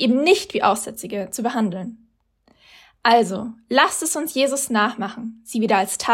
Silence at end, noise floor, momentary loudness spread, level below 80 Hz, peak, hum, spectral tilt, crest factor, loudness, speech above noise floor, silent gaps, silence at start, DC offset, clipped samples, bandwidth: 0 s; -61 dBFS; 12 LU; -64 dBFS; -2 dBFS; none; -3 dB/octave; 18 dB; -20 LUFS; 41 dB; none; 0 s; under 0.1%; under 0.1%; 16.5 kHz